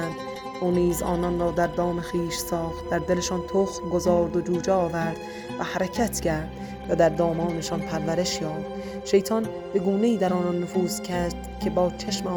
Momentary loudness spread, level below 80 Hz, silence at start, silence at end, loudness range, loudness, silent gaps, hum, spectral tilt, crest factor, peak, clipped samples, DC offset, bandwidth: 8 LU; -44 dBFS; 0 s; 0 s; 1 LU; -26 LUFS; none; none; -5.5 dB/octave; 18 dB; -8 dBFS; under 0.1%; under 0.1%; 19.5 kHz